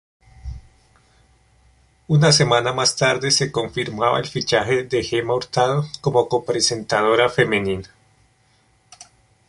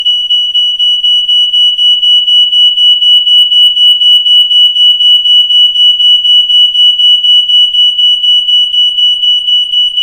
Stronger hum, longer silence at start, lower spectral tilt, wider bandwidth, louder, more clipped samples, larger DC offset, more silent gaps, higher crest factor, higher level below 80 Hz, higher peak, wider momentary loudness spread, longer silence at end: neither; first, 0.45 s vs 0 s; first, -4 dB/octave vs 3.5 dB/octave; second, 11.5 kHz vs 15.5 kHz; second, -19 LUFS vs -3 LUFS; second, under 0.1% vs 0.5%; neither; neither; first, 20 dB vs 6 dB; about the same, -48 dBFS vs -50 dBFS; about the same, -2 dBFS vs 0 dBFS; first, 10 LU vs 4 LU; first, 0.45 s vs 0 s